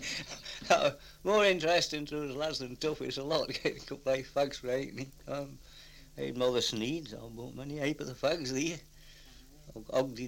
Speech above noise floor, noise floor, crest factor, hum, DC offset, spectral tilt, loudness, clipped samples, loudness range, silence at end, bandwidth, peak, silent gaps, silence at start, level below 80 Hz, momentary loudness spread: 22 dB; -55 dBFS; 22 dB; none; under 0.1%; -4 dB/octave; -33 LUFS; under 0.1%; 6 LU; 0 s; 16.5 kHz; -12 dBFS; none; 0 s; -58 dBFS; 17 LU